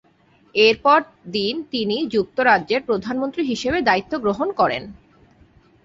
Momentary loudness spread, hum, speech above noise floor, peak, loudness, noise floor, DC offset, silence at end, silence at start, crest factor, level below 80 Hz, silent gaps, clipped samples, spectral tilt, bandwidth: 8 LU; none; 37 dB; -2 dBFS; -20 LUFS; -56 dBFS; under 0.1%; 0.9 s; 0.55 s; 18 dB; -52 dBFS; none; under 0.1%; -4.5 dB/octave; 7.8 kHz